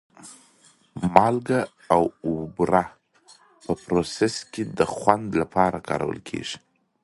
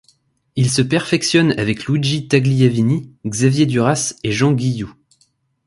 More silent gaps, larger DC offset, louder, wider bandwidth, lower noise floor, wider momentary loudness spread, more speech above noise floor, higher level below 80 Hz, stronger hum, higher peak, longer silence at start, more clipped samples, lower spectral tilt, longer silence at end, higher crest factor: neither; neither; second, -24 LUFS vs -17 LUFS; about the same, 11.5 kHz vs 11.5 kHz; about the same, -58 dBFS vs -61 dBFS; first, 13 LU vs 7 LU; second, 35 dB vs 45 dB; about the same, -52 dBFS vs -50 dBFS; neither; about the same, 0 dBFS vs 0 dBFS; second, 0.2 s vs 0.55 s; neither; about the same, -5.5 dB/octave vs -5.5 dB/octave; second, 0.45 s vs 0.75 s; first, 24 dB vs 16 dB